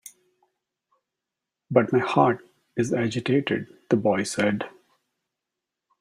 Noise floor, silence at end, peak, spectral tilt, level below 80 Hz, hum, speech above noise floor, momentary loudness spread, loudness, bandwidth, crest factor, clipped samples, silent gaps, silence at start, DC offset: -86 dBFS; 1.3 s; -4 dBFS; -6 dB/octave; -66 dBFS; none; 63 dB; 10 LU; -24 LUFS; 14 kHz; 22 dB; under 0.1%; none; 1.7 s; under 0.1%